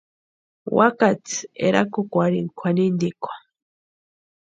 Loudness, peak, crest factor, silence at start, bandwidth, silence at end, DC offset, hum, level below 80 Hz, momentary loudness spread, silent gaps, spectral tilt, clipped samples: -21 LUFS; 0 dBFS; 22 dB; 0.65 s; 8.8 kHz; 1.15 s; under 0.1%; none; -66 dBFS; 15 LU; none; -6 dB/octave; under 0.1%